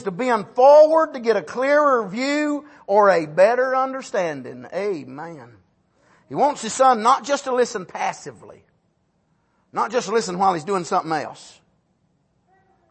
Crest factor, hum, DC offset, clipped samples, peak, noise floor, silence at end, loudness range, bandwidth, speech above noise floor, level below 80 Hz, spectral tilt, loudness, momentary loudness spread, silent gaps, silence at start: 18 dB; none; under 0.1%; under 0.1%; -4 dBFS; -66 dBFS; 1.45 s; 8 LU; 8.8 kHz; 47 dB; -70 dBFS; -4 dB/octave; -19 LUFS; 15 LU; none; 0 s